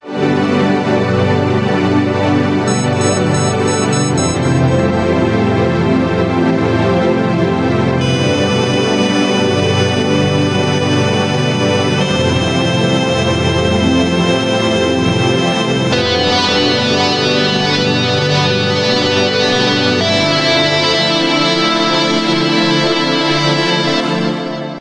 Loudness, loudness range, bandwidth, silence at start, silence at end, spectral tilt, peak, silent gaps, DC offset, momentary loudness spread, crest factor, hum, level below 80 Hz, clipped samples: -13 LUFS; 2 LU; 11 kHz; 0.05 s; 0 s; -5 dB/octave; 0 dBFS; none; under 0.1%; 2 LU; 12 dB; none; -44 dBFS; under 0.1%